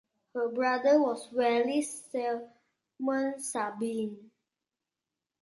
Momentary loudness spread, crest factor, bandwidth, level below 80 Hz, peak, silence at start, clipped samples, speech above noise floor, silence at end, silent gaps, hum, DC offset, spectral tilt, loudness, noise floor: 11 LU; 18 dB; 11.5 kHz; -82 dBFS; -14 dBFS; 0.35 s; under 0.1%; 60 dB; 1.2 s; none; none; under 0.1%; -3.5 dB/octave; -30 LUFS; -90 dBFS